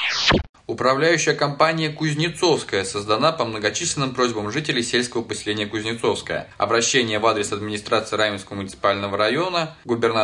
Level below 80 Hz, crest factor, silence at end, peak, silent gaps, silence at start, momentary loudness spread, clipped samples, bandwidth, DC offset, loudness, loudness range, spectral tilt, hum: -46 dBFS; 18 dB; 0 s; -4 dBFS; 0.49-0.53 s; 0 s; 8 LU; under 0.1%; 11 kHz; under 0.1%; -21 LUFS; 2 LU; -3.5 dB/octave; none